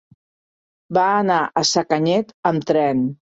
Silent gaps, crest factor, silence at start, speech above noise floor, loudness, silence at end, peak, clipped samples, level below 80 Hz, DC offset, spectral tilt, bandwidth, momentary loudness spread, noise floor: 2.34-2.43 s; 18 dB; 0.9 s; over 72 dB; -19 LUFS; 0.1 s; -2 dBFS; under 0.1%; -62 dBFS; under 0.1%; -4.5 dB/octave; 8 kHz; 4 LU; under -90 dBFS